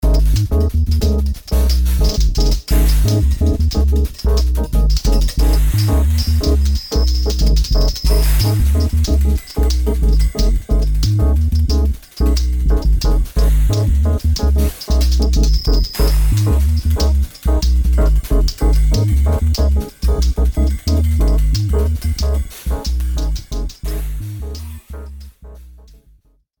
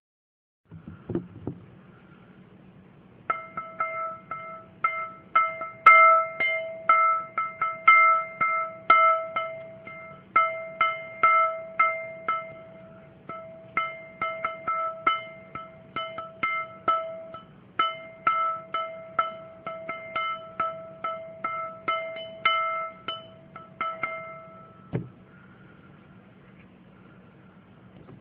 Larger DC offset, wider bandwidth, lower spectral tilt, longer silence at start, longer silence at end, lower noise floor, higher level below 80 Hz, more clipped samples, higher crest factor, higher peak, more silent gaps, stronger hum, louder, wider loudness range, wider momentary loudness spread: neither; first, 19.5 kHz vs 4.7 kHz; about the same, -6 dB/octave vs -6 dB/octave; second, 0 s vs 0.7 s; first, 0.9 s vs 0.05 s; about the same, -52 dBFS vs -52 dBFS; first, -14 dBFS vs -68 dBFS; neither; second, 12 dB vs 24 dB; about the same, -2 dBFS vs -4 dBFS; neither; neither; first, -17 LUFS vs -25 LUFS; second, 4 LU vs 17 LU; second, 6 LU vs 22 LU